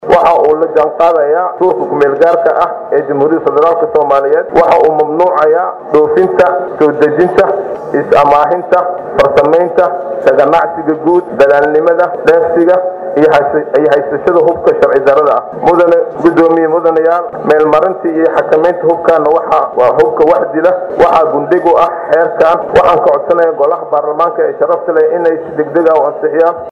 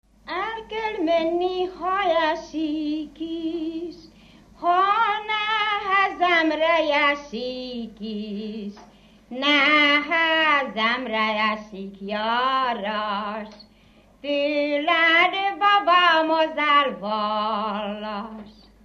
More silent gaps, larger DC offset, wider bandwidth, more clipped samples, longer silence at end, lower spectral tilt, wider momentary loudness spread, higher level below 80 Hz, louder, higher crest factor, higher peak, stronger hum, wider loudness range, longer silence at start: neither; neither; about the same, 7.6 kHz vs 7.8 kHz; first, 0.6% vs under 0.1%; second, 0 s vs 0.35 s; first, -7 dB/octave vs -4 dB/octave; second, 5 LU vs 16 LU; first, -46 dBFS vs -58 dBFS; first, -9 LUFS vs -21 LUFS; second, 8 dB vs 18 dB; first, 0 dBFS vs -4 dBFS; neither; second, 1 LU vs 6 LU; second, 0 s vs 0.25 s